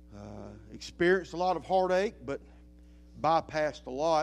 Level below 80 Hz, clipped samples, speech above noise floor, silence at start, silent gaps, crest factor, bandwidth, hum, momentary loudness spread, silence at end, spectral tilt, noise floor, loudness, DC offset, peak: -54 dBFS; under 0.1%; 25 dB; 0.1 s; none; 18 dB; 11 kHz; none; 18 LU; 0 s; -5.5 dB/octave; -54 dBFS; -30 LUFS; under 0.1%; -14 dBFS